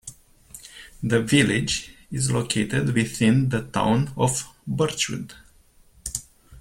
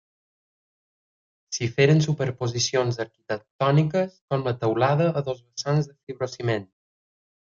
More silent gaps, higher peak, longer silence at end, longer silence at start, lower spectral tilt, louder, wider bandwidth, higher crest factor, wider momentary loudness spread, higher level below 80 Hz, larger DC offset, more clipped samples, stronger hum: second, none vs 3.51-3.59 s, 4.21-4.28 s, 6.03-6.07 s; about the same, -4 dBFS vs -6 dBFS; second, 0 s vs 0.9 s; second, 0.05 s vs 1.5 s; about the same, -4.5 dB/octave vs -5.5 dB/octave; about the same, -23 LUFS vs -24 LUFS; first, 16.5 kHz vs 7.4 kHz; about the same, 20 dB vs 20 dB; first, 19 LU vs 12 LU; first, -50 dBFS vs -62 dBFS; neither; neither; neither